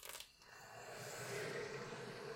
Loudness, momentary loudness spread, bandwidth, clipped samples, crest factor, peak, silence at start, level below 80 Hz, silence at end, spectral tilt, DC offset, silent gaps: -49 LUFS; 11 LU; 16.5 kHz; under 0.1%; 16 dB; -34 dBFS; 0 s; -78 dBFS; 0 s; -3 dB/octave; under 0.1%; none